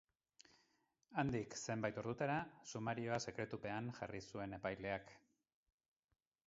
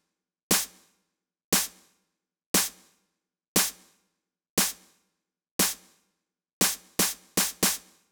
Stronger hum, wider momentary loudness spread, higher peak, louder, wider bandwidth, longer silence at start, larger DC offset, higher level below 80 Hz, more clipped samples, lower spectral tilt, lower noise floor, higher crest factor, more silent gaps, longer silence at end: neither; about the same, 7 LU vs 9 LU; second, -24 dBFS vs -8 dBFS; second, -45 LUFS vs -26 LUFS; second, 7.6 kHz vs over 20 kHz; first, 1.1 s vs 0.5 s; neither; second, -72 dBFS vs -60 dBFS; neither; first, -5 dB/octave vs -1.5 dB/octave; about the same, -82 dBFS vs -81 dBFS; about the same, 22 dB vs 22 dB; second, none vs 1.44-1.52 s, 2.46-2.54 s, 3.48-3.55 s, 4.50-4.57 s, 5.51-5.59 s, 6.53-6.61 s; first, 1.3 s vs 0.35 s